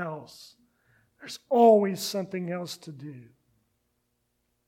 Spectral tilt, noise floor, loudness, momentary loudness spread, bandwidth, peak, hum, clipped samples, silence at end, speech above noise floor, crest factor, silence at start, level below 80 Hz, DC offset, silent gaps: -5.5 dB/octave; -76 dBFS; -24 LUFS; 25 LU; 16.5 kHz; -8 dBFS; 60 Hz at -55 dBFS; under 0.1%; 1.45 s; 50 dB; 20 dB; 0 s; -78 dBFS; under 0.1%; none